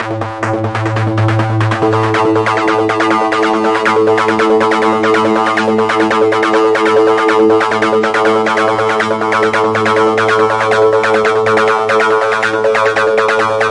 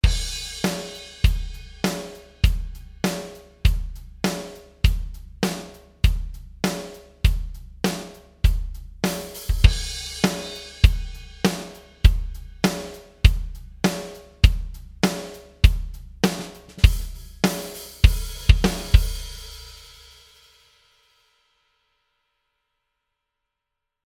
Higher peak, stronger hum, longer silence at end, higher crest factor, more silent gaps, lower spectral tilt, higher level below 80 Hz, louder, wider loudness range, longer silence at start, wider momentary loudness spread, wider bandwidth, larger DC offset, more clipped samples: about the same, 0 dBFS vs 0 dBFS; neither; second, 0 s vs 4.3 s; second, 12 dB vs 22 dB; neither; about the same, -5.5 dB/octave vs -5 dB/octave; second, -50 dBFS vs -24 dBFS; first, -11 LUFS vs -24 LUFS; second, 1 LU vs 4 LU; about the same, 0 s vs 0.05 s; second, 3 LU vs 18 LU; second, 11 kHz vs 16 kHz; neither; neither